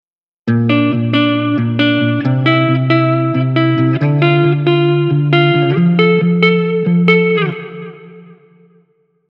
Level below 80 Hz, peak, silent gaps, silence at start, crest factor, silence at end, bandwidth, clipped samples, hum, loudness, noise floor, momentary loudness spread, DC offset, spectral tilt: -66 dBFS; 0 dBFS; none; 0.45 s; 14 dB; 1 s; 5.6 kHz; under 0.1%; none; -13 LUFS; -56 dBFS; 5 LU; under 0.1%; -9 dB/octave